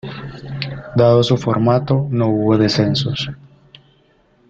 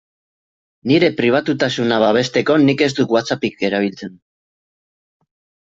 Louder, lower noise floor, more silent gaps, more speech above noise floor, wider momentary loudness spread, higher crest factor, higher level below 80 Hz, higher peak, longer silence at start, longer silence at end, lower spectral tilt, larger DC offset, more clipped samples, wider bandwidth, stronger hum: about the same, -16 LUFS vs -16 LUFS; second, -55 dBFS vs under -90 dBFS; neither; second, 40 dB vs over 74 dB; first, 14 LU vs 9 LU; about the same, 16 dB vs 16 dB; first, -48 dBFS vs -58 dBFS; about the same, -2 dBFS vs -2 dBFS; second, 0.05 s vs 0.85 s; second, 1.15 s vs 1.55 s; first, -7 dB/octave vs -5.5 dB/octave; neither; neither; about the same, 7.8 kHz vs 7.8 kHz; neither